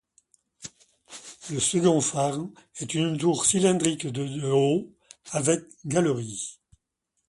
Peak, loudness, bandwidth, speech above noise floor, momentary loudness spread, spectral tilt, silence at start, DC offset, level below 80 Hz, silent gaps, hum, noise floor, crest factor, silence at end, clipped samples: -6 dBFS; -25 LUFS; 11.5 kHz; 54 dB; 22 LU; -4.5 dB/octave; 0.6 s; under 0.1%; -64 dBFS; none; none; -79 dBFS; 20 dB; 0.75 s; under 0.1%